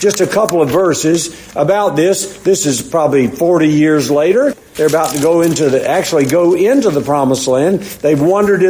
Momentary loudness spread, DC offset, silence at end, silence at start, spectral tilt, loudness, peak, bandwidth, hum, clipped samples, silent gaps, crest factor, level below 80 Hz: 4 LU; under 0.1%; 0 s; 0 s; -5 dB/octave; -12 LUFS; 0 dBFS; 16 kHz; none; under 0.1%; none; 12 dB; -48 dBFS